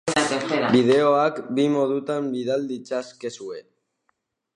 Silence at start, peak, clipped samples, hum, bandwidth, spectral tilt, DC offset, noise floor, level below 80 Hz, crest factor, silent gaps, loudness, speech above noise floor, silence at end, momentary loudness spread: 0.05 s; -6 dBFS; under 0.1%; none; 11 kHz; -5 dB/octave; under 0.1%; -73 dBFS; -66 dBFS; 18 dB; none; -22 LUFS; 51 dB; 0.95 s; 16 LU